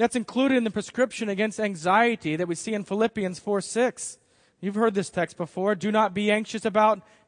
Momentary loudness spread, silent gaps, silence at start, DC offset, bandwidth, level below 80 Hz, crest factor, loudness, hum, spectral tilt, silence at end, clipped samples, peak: 8 LU; none; 0 s; under 0.1%; 10.5 kHz; -68 dBFS; 18 dB; -25 LUFS; none; -5 dB/octave; 0.25 s; under 0.1%; -6 dBFS